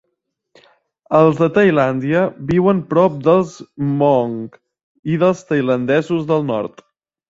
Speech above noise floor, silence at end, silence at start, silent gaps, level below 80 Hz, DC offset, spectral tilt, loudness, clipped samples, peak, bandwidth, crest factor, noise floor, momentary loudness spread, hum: 58 dB; 0.65 s; 1.1 s; 4.83-5.03 s; -54 dBFS; under 0.1%; -8 dB/octave; -16 LUFS; under 0.1%; -2 dBFS; 7.8 kHz; 16 dB; -74 dBFS; 11 LU; none